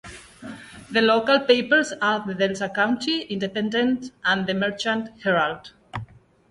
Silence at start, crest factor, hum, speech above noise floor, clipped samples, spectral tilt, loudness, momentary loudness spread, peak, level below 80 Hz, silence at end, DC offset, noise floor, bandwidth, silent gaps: 0.05 s; 18 dB; none; 22 dB; under 0.1%; -4.5 dB/octave; -22 LUFS; 19 LU; -4 dBFS; -58 dBFS; 0.45 s; under 0.1%; -44 dBFS; 11.5 kHz; none